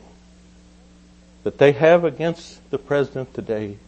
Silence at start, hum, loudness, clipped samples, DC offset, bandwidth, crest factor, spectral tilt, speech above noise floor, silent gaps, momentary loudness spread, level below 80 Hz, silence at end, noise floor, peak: 1.45 s; none; -20 LUFS; under 0.1%; under 0.1%; 8.6 kHz; 20 dB; -7 dB/octave; 29 dB; none; 15 LU; -52 dBFS; 0.1 s; -49 dBFS; -2 dBFS